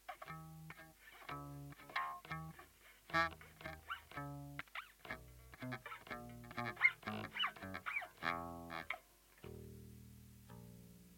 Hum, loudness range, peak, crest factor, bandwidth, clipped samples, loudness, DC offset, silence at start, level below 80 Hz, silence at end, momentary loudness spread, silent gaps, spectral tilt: none; 8 LU; -18 dBFS; 28 dB; 17 kHz; under 0.1%; -44 LUFS; under 0.1%; 0 s; -68 dBFS; 0 s; 21 LU; none; -4 dB/octave